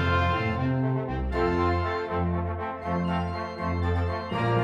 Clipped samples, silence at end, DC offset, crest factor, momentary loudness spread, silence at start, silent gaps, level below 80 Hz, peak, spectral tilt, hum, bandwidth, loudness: under 0.1%; 0 s; under 0.1%; 14 dB; 6 LU; 0 s; none; -38 dBFS; -12 dBFS; -8 dB/octave; none; 7.4 kHz; -28 LUFS